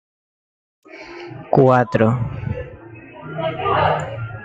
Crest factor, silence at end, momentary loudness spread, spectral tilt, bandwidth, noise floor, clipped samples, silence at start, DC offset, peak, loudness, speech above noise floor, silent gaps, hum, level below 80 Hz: 18 dB; 0 s; 23 LU; -8 dB/octave; 7.8 kHz; -39 dBFS; under 0.1%; 0.9 s; under 0.1%; -2 dBFS; -18 LUFS; 21 dB; none; none; -46 dBFS